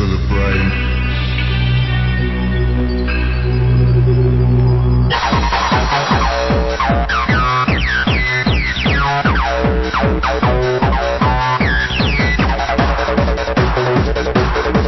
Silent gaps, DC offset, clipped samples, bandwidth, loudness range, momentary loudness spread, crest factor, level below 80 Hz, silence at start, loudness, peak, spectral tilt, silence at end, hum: none; under 0.1%; under 0.1%; 6.2 kHz; 2 LU; 4 LU; 14 dB; -20 dBFS; 0 s; -15 LUFS; 0 dBFS; -6.5 dB/octave; 0 s; none